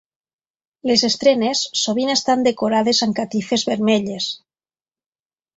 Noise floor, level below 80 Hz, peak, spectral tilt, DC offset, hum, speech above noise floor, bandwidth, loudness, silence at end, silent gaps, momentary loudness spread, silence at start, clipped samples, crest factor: under -90 dBFS; -62 dBFS; -2 dBFS; -3.5 dB/octave; under 0.1%; none; over 72 dB; 8 kHz; -18 LUFS; 1.2 s; none; 8 LU; 0.85 s; under 0.1%; 18 dB